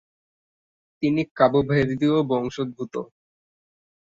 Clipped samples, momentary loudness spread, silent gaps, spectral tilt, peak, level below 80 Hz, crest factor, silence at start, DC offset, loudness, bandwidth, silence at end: under 0.1%; 13 LU; 1.31-1.36 s; -7.5 dB/octave; -4 dBFS; -54 dBFS; 22 dB; 1 s; under 0.1%; -23 LUFS; 7.6 kHz; 1.1 s